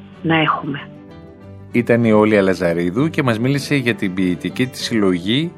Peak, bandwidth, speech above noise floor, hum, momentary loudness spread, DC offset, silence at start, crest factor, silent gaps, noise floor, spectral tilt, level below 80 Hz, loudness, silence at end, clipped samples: 0 dBFS; 16 kHz; 22 dB; none; 9 LU; under 0.1%; 0 s; 16 dB; none; -38 dBFS; -6 dB/octave; -52 dBFS; -17 LUFS; 0.05 s; under 0.1%